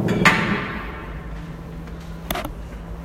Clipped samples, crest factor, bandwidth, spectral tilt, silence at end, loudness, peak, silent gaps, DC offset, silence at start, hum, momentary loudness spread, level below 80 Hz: under 0.1%; 24 dB; 16 kHz; -5 dB/octave; 0 s; -22 LUFS; 0 dBFS; none; under 0.1%; 0 s; none; 19 LU; -36 dBFS